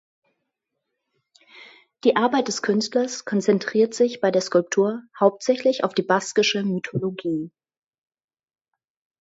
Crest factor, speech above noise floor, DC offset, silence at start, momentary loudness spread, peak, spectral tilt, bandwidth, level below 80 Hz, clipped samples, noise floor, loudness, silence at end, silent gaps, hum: 20 dB; 59 dB; under 0.1%; 1.55 s; 7 LU; -2 dBFS; -4.5 dB/octave; 8 kHz; -72 dBFS; under 0.1%; -80 dBFS; -22 LUFS; 1.7 s; none; none